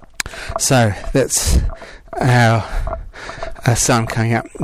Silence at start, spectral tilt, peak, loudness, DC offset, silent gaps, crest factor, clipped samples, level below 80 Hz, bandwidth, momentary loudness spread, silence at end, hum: 0 s; -4.5 dB/octave; 0 dBFS; -16 LUFS; under 0.1%; none; 16 dB; under 0.1%; -26 dBFS; 15.5 kHz; 16 LU; 0 s; none